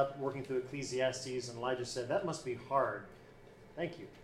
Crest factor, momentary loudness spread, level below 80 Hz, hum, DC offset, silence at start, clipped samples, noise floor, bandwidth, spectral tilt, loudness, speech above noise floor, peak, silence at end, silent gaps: 20 dB; 18 LU; -66 dBFS; none; under 0.1%; 0 s; under 0.1%; -57 dBFS; 13.5 kHz; -4.5 dB/octave; -38 LUFS; 20 dB; -18 dBFS; 0 s; none